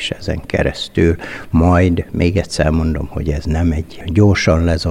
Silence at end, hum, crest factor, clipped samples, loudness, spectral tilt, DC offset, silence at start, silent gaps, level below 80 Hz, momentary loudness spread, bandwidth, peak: 0 s; none; 12 dB; under 0.1%; -16 LUFS; -6.5 dB/octave; under 0.1%; 0 s; none; -26 dBFS; 9 LU; 11.5 kHz; -2 dBFS